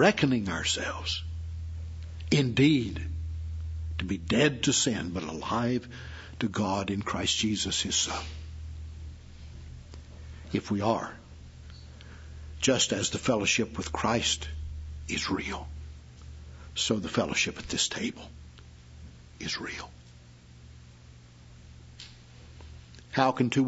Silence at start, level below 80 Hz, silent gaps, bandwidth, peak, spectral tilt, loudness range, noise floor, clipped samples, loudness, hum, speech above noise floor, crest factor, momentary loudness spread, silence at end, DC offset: 0 s; -46 dBFS; none; 8 kHz; -6 dBFS; -4 dB/octave; 13 LU; -52 dBFS; under 0.1%; -29 LUFS; 60 Hz at -55 dBFS; 24 dB; 24 dB; 23 LU; 0 s; under 0.1%